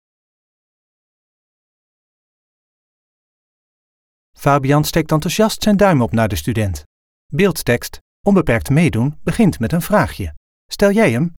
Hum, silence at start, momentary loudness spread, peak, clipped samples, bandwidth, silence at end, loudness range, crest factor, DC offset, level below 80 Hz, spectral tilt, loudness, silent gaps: none; 4.4 s; 9 LU; -2 dBFS; under 0.1%; 18.5 kHz; 0.05 s; 4 LU; 16 dB; under 0.1%; -38 dBFS; -6 dB/octave; -16 LUFS; 6.86-7.29 s, 8.01-8.24 s, 10.37-10.69 s